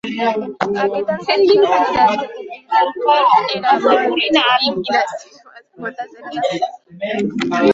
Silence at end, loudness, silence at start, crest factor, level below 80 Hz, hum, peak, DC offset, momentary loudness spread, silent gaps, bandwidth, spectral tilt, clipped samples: 0 s; -16 LUFS; 0.05 s; 14 dB; -58 dBFS; none; -2 dBFS; under 0.1%; 15 LU; none; 7.8 kHz; -4.5 dB/octave; under 0.1%